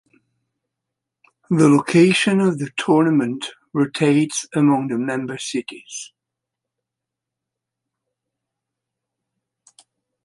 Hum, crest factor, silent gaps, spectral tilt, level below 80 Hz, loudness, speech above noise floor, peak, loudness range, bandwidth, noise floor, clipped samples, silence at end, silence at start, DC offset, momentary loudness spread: none; 20 dB; none; -5.5 dB/octave; -68 dBFS; -18 LUFS; 66 dB; -2 dBFS; 14 LU; 11.5 kHz; -84 dBFS; under 0.1%; 4.2 s; 1.5 s; under 0.1%; 16 LU